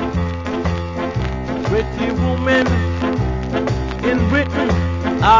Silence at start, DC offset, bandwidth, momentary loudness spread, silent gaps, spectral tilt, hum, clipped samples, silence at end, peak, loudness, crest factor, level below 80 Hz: 0 s; under 0.1%; 7.6 kHz; 7 LU; none; -7 dB/octave; none; under 0.1%; 0 s; 0 dBFS; -19 LUFS; 16 dB; -26 dBFS